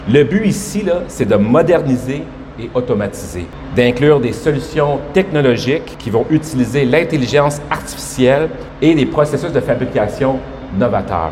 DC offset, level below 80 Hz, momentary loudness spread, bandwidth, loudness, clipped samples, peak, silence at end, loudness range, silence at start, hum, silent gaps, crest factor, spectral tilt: under 0.1%; -36 dBFS; 10 LU; 16 kHz; -15 LUFS; under 0.1%; 0 dBFS; 0 s; 2 LU; 0 s; none; none; 14 dB; -6 dB/octave